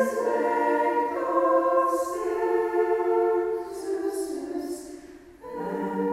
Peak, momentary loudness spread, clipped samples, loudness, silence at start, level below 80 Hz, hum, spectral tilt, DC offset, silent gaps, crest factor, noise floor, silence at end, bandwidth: -10 dBFS; 13 LU; under 0.1%; -26 LUFS; 0 s; -62 dBFS; none; -5.5 dB/octave; under 0.1%; none; 16 dB; -46 dBFS; 0 s; 15.5 kHz